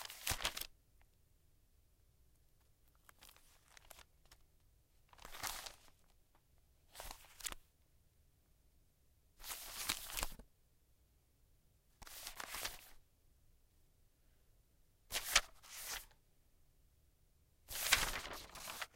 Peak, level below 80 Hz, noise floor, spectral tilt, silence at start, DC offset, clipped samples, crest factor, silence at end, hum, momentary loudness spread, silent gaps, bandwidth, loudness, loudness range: -14 dBFS; -60 dBFS; -73 dBFS; 0 dB/octave; 0 s; under 0.1%; under 0.1%; 36 dB; 0.1 s; none; 26 LU; none; 16.5 kHz; -41 LUFS; 16 LU